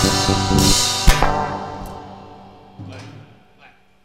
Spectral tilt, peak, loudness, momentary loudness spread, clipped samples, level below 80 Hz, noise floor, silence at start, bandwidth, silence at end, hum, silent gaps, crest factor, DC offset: -3.5 dB/octave; 0 dBFS; -17 LUFS; 24 LU; under 0.1%; -26 dBFS; -51 dBFS; 0 s; 16 kHz; 0.8 s; none; none; 20 dB; 0.1%